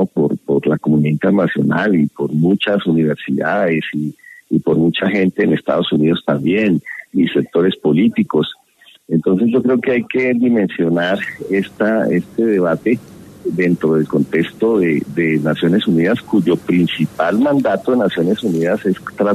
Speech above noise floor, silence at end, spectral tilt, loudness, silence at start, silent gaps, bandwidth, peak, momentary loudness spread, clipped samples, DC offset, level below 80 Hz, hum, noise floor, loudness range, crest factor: 34 dB; 0 s; -8 dB/octave; -16 LUFS; 0 s; none; 13.5 kHz; -2 dBFS; 5 LU; under 0.1%; under 0.1%; -56 dBFS; none; -49 dBFS; 1 LU; 12 dB